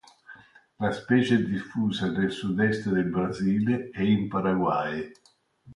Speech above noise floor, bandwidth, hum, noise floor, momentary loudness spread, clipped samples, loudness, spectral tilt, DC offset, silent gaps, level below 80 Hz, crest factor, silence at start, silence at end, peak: 29 dB; 11 kHz; none; -55 dBFS; 6 LU; under 0.1%; -26 LUFS; -7 dB/octave; under 0.1%; none; -56 dBFS; 18 dB; 0.3 s; 0 s; -8 dBFS